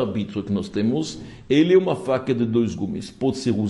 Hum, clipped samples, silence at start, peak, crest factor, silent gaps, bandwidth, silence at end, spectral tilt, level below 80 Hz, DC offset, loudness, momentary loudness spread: none; under 0.1%; 0 s; -6 dBFS; 16 dB; none; 11.5 kHz; 0 s; -6.5 dB/octave; -54 dBFS; under 0.1%; -22 LUFS; 11 LU